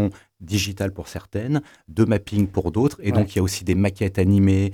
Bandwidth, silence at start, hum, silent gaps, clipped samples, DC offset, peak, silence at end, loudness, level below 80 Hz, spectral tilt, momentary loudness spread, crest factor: 16 kHz; 0 s; none; none; under 0.1%; under 0.1%; -6 dBFS; 0 s; -22 LUFS; -48 dBFS; -6.5 dB/octave; 10 LU; 16 dB